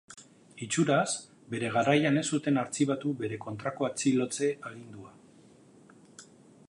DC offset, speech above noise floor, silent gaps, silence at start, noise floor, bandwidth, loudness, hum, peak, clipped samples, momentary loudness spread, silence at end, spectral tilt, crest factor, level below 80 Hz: under 0.1%; 28 dB; none; 0.1 s; -57 dBFS; 11.5 kHz; -29 LUFS; none; -10 dBFS; under 0.1%; 19 LU; 0.45 s; -5 dB/octave; 20 dB; -74 dBFS